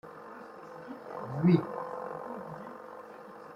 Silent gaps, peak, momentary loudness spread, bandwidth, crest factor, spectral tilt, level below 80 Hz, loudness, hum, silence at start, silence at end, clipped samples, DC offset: none; -12 dBFS; 21 LU; 5.6 kHz; 24 dB; -9.5 dB/octave; -72 dBFS; -32 LUFS; none; 0.05 s; 0 s; under 0.1%; under 0.1%